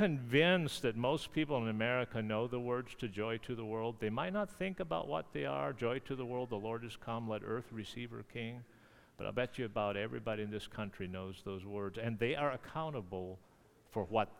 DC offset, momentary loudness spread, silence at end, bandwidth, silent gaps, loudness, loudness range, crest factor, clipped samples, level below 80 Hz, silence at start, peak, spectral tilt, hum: under 0.1%; 10 LU; 0 s; 16.5 kHz; none; -38 LUFS; 5 LU; 22 dB; under 0.1%; -64 dBFS; 0 s; -16 dBFS; -6 dB/octave; none